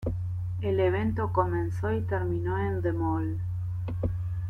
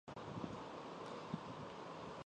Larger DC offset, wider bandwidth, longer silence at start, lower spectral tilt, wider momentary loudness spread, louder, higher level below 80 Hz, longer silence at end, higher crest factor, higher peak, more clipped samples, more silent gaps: neither; second, 3.9 kHz vs 10 kHz; about the same, 0 s vs 0.05 s; first, -9.5 dB/octave vs -6 dB/octave; first, 7 LU vs 3 LU; first, -29 LUFS vs -49 LUFS; first, -44 dBFS vs -72 dBFS; about the same, 0 s vs 0 s; about the same, 16 dB vs 18 dB; first, -12 dBFS vs -30 dBFS; neither; neither